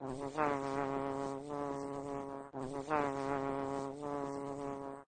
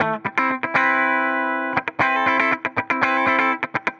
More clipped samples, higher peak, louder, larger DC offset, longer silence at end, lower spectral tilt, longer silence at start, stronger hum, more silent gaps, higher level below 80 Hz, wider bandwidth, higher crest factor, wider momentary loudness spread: neither; second, -18 dBFS vs -4 dBFS; second, -39 LUFS vs -19 LUFS; neither; about the same, 0.05 s vs 0.05 s; about the same, -6.5 dB/octave vs -5.5 dB/octave; about the same, 0 s vs 0 s; neither; neither; about the same, -64 dBFS vs -64 dBFS; first, 9.4 kHz vs 8.4 kHz; about the same, 20 dB vs 16 dB; about the same, 7 LU vs 5 LU